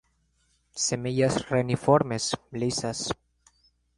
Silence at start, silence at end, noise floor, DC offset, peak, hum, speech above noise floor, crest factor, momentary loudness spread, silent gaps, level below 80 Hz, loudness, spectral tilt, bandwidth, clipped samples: 0.75 s; 0.85 s; -69 dBFS; under 0.1%; -6 dBFS; 60 Hz at -50 dBFS; 43 dB; 22 dB; 10 LU; none; -56 dBFS; -27 LUFS; -4.5 dB/octave; 11.5 kHz; under 0.1%